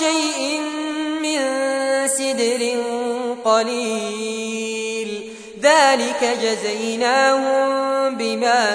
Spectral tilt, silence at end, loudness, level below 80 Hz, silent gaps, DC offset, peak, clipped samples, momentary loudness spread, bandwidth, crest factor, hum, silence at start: -2 dB/octave; 0 s; -19 LUFS; -66 dBFS; none; under 0.1%; -2 dBFS; under 0.1%; 9 LU; 11 kHz; 18 dB; none; 0 s